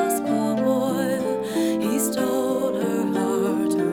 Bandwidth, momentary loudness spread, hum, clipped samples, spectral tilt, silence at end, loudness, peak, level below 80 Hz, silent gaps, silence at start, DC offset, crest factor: 19 kHz; 2 LU; none; under 0.1%; -5 dB/octave; 0 s; -23 LUFS; -10 dBFS; -62 dBFS; none; 0 s; under 0.1%; 12 dB